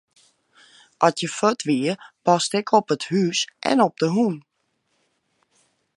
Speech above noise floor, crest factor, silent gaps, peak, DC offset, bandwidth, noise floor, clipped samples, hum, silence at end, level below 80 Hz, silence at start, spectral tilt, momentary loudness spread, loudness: 51 dB; 22 dB; none; -2 dBFS; under 0.1%; 11.5 kHz; -71 dBFS; under 0.1%; none; 1.55 s; -74 dBFS; 1 s; -4.5 dB/octave; 5 LU; -21 LUFS